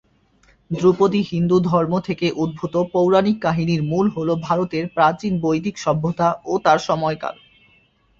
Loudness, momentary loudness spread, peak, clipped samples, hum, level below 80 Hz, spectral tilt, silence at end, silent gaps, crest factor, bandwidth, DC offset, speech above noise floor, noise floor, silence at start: -19 LUFS; 6 LU; -2 dBFS; under 0.1%; none; -52 dBFS; -7 dB/octave; 0.85 s; none; 18 dB; 7.6 kHz; under 0.1%; 39 dB; -58 dBFS; 0.7 s